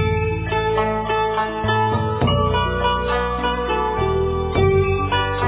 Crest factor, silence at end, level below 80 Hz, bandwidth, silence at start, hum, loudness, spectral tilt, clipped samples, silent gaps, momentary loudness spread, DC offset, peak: 14 dB; 0 s; -30 dBFS; 4 kHz; 0 s; none; -20 LUFS; -10.5 dB/octave; under 0.1%; none; 4 LU; under 0.1%; -4 dBFS